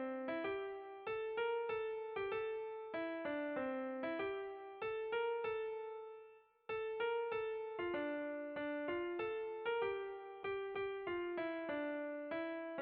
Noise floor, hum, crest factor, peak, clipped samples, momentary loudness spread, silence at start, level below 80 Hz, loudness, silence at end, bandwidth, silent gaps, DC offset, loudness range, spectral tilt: -63 dBFS; none; 14 dB; -30 dBFS; under 0.1%; 7 LU; 0 s; -76 dBFS; -43 LUFS; 0 s; 4.8 kHz; none; under 0.1%; 1 LU; -2.5 dB/octave